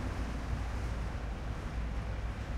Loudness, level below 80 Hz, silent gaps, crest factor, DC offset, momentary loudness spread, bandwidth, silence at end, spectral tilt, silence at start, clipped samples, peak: -39 LUFS; -38 dBFS; none; 12 dB; under 0.1%; 2 LU; 11 kHz; 0 s; -6.5 dB/octave; 0 s; under 0.1%; -24 dBFS